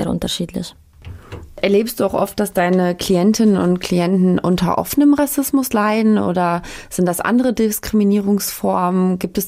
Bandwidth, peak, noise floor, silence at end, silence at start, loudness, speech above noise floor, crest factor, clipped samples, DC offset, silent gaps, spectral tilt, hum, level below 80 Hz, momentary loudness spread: 16 kHz; -4 dBFS; -37 dBFS; 0 s; 0 s; -17 LUFS; 20 dB; 12 dB; under 0.1%; under 0.1%; none; -5.5 dB/octave; none; -42 dBFS; 8 LU